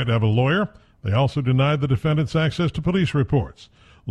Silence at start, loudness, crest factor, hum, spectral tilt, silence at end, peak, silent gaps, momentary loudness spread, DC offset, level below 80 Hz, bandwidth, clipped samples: 0 s; -21 LUFS; 14 dB; none; -7.5 dB/octave; 0 s; -8 dBFS; none; 8 LU; under 0.1%; -44 dBFS; 9.4 kHz; under 0.1%